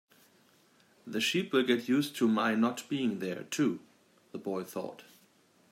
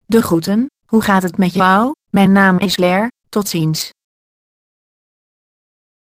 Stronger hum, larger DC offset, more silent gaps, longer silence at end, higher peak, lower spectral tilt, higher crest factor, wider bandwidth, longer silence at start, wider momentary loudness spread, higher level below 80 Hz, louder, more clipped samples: neither; neither; neither; second, 0.7 s vs 2.2 s; second, -14 dBFS vs 0 dBFS; about the same, -4.5 dB/octave vs -5.5 dB/octave; about the same, 20 dB vs 16 dB; about the same, 16 kHz vs 15.5 kHz; first, 1.05 s vs 0.1 s; first, 13 LU vs 8 LU; second, -80 dBFS vs -50 dBFS; second, -31 LUFS vs -14 LUFS; neither